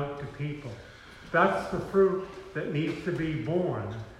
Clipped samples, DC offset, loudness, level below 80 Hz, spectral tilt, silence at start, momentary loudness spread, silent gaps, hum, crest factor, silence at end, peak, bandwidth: under 0.1%; under 0.1%; -29 LUFS; -54 dBFS; -7.5 dB/octave; 0 s; 16 LU; none; none; 20 dB; 0 s; -10 dBFS; 11.5 kHz